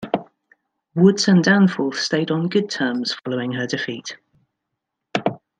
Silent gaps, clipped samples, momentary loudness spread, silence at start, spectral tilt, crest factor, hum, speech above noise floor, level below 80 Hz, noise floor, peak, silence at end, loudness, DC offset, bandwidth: none; under 0.1%; 13 LU; 0 s; -5.5 dB/octave; 18 dB; none; 61 dB; -66 dBFS; -80 dBFS; -2 dBFS; 0.25 s; -20 LUFS; under 0.1%; 9.2 kHz